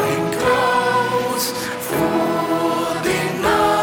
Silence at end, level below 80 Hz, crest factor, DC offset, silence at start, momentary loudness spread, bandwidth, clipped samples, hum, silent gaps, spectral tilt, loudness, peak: 0 s; -46 dBFS; 12 dB; under 0.1%; 0 s; 5 LU; 20 kHz; under 0.1%; none; none; -4 dB/octave; -19 LUFS; -6 dBFS